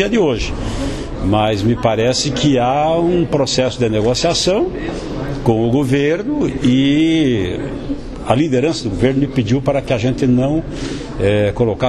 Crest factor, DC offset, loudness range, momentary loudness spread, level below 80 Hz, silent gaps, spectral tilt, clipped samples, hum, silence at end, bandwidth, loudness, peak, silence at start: 16 dB; under 0.1%; 2 LU; 10 LU; -32 dBFS; none; -5.5 dB/octave; under 0.1%; none; 0 s; 12 kHz; -16 LUFS; 0 dBFS; 0 s